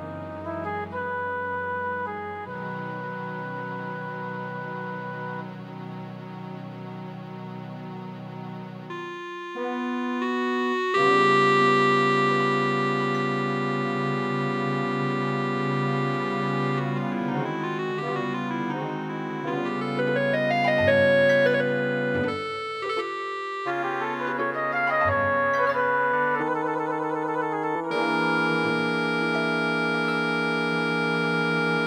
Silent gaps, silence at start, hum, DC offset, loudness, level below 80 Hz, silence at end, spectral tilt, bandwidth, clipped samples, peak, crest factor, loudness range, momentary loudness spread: none; 0 s; none; under 0.1%; -25 LUFS; -68 dBFS; 0 s; -6.5 dB/octave; 11.5 kHz; under 0.1%; -8 dBFS; 18 dB; 13 LU; 17 LU